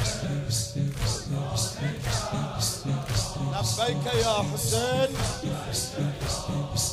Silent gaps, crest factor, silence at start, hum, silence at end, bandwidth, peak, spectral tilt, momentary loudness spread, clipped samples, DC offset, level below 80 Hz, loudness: none; 16 dB; 0 s; none; 0 s; 16 kHz; -12 dBFS; -4 dB/octave; 5 LU; under 0.1%; under 0.1%; -42 dBFS; -28 LUFS